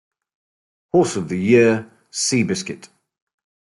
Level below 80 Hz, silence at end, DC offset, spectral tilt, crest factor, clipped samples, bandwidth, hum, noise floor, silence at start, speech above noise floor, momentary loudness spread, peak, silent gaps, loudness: -62 dBFS; 0.9 s; under 0.1%; -4.5 dB/octave; 18 dB; under 0.1%; 11.5 kHz; none; under -90 dBFS; 0.95 s; over 72 dB; 16 LU; -4 dBFS; none; -18 LUFS